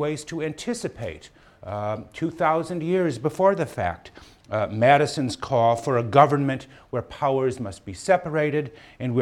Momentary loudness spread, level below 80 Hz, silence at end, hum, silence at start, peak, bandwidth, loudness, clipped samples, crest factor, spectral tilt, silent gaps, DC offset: 15 LU; -56 dBFS; 0 s; none; 0 s; -2 dBFS; 13 kHz; -24 LUFS; under 0.1%; 22 dB; -6 dB/octave; none; under 0.1%